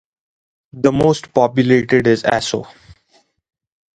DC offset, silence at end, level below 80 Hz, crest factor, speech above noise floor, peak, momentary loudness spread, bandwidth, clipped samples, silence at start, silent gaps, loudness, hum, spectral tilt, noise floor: under 0.1%; 1.3 s; -48 dBFS; 18 dB; 43 dB; 0 dBFS; 6 LU; 9.4 kHz; under 0.1%; 0.75 s; none; -15 LUFS; none; -6 dB/octave; -58 dBFS